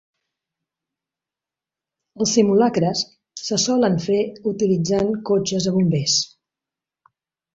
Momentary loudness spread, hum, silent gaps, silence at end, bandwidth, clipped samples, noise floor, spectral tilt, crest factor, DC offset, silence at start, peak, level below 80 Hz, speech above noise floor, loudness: 8 LU; none; none; 1.3 s; 7.8 kHz; under 0.1%; -89 dBFS; -5 dB/octave; 18 dB; under 0.1%; 2.15 s; -4 dBFS; -58 dBFS; 70 dB; -20 LUFS